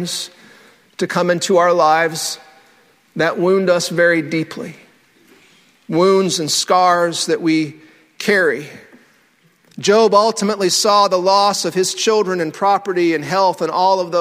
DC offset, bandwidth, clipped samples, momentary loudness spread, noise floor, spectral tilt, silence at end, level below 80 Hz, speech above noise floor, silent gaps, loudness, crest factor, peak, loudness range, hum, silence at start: under 0.1%; 16 kHz; under 0.1%; 11 LU; -55 dBFS; -3.5 dB/octave; 0 s; -66 dBFS; 40 dB; none; -15 LUFS; 16 dB; 0 dBFS; 4 LU; none; 0 s